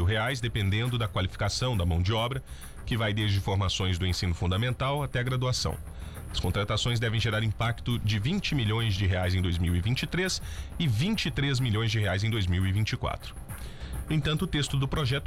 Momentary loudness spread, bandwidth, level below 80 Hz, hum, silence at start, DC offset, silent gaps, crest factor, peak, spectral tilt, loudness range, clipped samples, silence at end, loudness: 8 LU; 15 kHz; -40 dBFS; none; 0 s; under 0.1%; none; 10 dB; -18 dBFS; -5 dB/octave; 1 LU; under 0.1%; 0 s; -28 LUFS